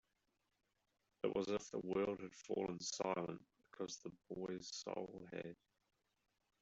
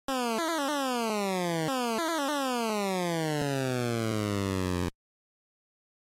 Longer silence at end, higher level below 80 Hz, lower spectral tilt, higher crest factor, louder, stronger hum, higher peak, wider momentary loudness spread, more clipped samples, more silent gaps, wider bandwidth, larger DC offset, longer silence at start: second, 1.1 s vs 1.25 s; second, -78 dBFS vs -58 dBFS; about the same, -4.5 dB/octave vs -4.5 dB/octave; first, 22 dB vs 12 dB; second, -45 LUFS vs -30 LUFS; neither; second, -26 dBFS vs -20 dBFS; first, 11 LU vs 1 LU; neither; neither; second, 8.2 kHz vs 16 kHz; neither; first, 1.25 s vs 0.1 s